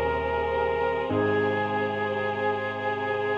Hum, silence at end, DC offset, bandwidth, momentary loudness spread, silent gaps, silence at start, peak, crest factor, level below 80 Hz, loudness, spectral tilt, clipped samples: none; 0 s; under 0.1%; 7 kHz; 3 LU; none; 0 s; -14 dBFS; 12 dB; -48 dBFS; -26 LUFS; -7.5 dB/octave; under 0.1%